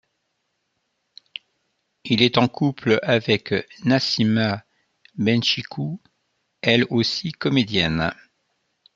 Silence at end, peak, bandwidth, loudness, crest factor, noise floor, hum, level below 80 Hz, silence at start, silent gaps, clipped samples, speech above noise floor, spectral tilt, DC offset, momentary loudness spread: 0.85 s; -2 dBFS; 7.6 kHz; -21 LUFS; 22 dB; -74 dBFS; none; -56 dBFS; 2.05 s; none; under 0.1%; 53 dB; -5.5 dB/octave; under 0.1%; 18 LU